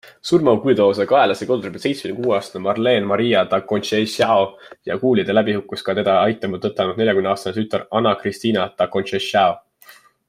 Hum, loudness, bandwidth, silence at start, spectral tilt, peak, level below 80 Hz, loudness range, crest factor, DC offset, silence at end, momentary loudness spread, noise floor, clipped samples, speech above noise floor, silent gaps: none; -19 LUFS; 15.5 kHz; 0.05 s; -5.5 dB/octave; -2 dBFS; -62 dBFS; 2 LU; 16 dB; under 0.1%; 0.35 s; 8 LU; -48 dBFS; under 0.1%; 30 dB; none